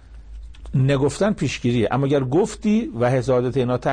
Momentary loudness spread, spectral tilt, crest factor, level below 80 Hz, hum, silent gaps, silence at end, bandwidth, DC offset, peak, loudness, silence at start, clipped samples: 3 LU; -7 dB/octave; 12 dB; -42 dBFS; none; none; 0 s; 9.8 kHz; under 0.1%; -8 dBFS; -20 LUFS; 0.05 s; under 0.1%